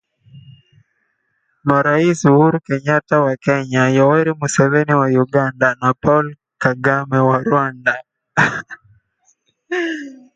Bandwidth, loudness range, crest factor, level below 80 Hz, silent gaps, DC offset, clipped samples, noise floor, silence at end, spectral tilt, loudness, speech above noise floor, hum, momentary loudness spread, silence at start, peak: 9.4 kHz; 4 LU; 16 dB; -54 dBFS; none; under 0.1%; under 0.1%; -67 dBFS; 0.2 s; -6.5 dB/octave; -16 LUFS; 52 dB; none; 9 LU; 0.35 s; 0 dBFS